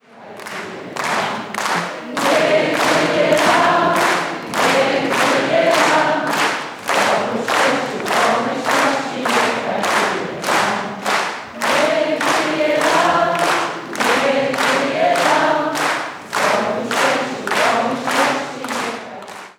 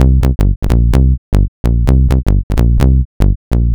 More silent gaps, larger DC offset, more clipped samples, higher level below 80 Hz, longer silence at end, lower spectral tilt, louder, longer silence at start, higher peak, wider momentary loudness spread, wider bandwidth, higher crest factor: second, none vs 0.56-0.62 s, 1.18-1.32 s, 1.48-1.64 s, 2.43-2.50 s, 3.05-3.20 s, 3.36-3.51 s; neither; neither; second, -62 dBFS vs -12 dBFS; about the same, 0.05 s vs 0 s; second, -3 dB/octave vs -8.5 dB/octave; second, -17 LUFS vs -13 LUFS; first, 0.15 s vs 0 s; about the same, -2 dBFS vs 0 dBFS; first, 9 LU vs 4 LU; first, over 20 kHz vs 9.2 kHz; first, 16 dB vs 10 dB